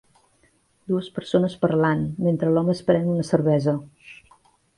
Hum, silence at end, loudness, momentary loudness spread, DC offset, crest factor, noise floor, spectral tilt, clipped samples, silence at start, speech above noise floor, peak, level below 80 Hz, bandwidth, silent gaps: none; 0.65 s; -22 LUFS; 7 LU; under 0.1%; 18 dB; -63 dBFS; -8 dB/octave; under 0.1%; 0.9 s; 41 dB; -4 dBFS; -56 dBFS; 11.5 kHz; none